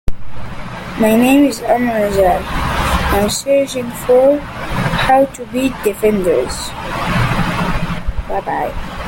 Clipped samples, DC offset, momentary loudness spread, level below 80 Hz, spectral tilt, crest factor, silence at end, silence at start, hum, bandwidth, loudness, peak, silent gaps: under 0.1%; under 0.1%; 12 LU; -26 dBFS; -5.5 dB/octave; 14 dB; 0 s; 0.05 s; none; 17 kHz; -15 LUFS; 0 dBFS; none